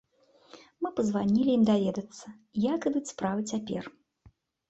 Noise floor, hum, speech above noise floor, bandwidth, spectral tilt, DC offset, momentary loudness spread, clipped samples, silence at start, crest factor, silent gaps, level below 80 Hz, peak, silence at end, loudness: -62 dBFS; none; 34 dB; 8.2 kHz; -6.5 dB/octave; under 0.1%; 14 LU; under 0.1%; 0.55 s; 16 dB; none; -66 dBFS; -14 dBFS; 0.8 s; -29 LUFS